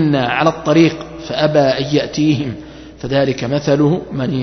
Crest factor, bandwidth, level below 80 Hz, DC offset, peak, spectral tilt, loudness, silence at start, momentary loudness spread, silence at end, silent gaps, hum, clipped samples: 16 dB; 6.4 kHz; -44 dBFS; under 0.1%; 0 dBFS; -6.5 dB/octave; -15 LUFS; 0 s; 12 LU; 0 s; none; none; under 0.1%